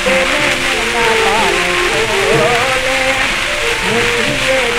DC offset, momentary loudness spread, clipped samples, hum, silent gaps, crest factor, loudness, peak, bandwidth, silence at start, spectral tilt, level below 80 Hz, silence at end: under 0.1%; 2 LU; under 0.1%; none; none; 12 dB; -12 LUFS; -2 dBFS; 16 kHz; 0 s; -2.5 dB/octave; -32 dBFS; 0 s